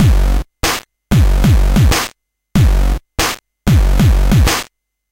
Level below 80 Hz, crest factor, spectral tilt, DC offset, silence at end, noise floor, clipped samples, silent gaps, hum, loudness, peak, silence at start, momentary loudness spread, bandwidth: -14 dBFS; 12 dB; -5 dB/octave; under 0.1%; 0.5 s; -38 dBFS; under 0.1%; none; none; -14 LUFS; 0 dBFS; 0 s; 7 LU; 16.5 kHz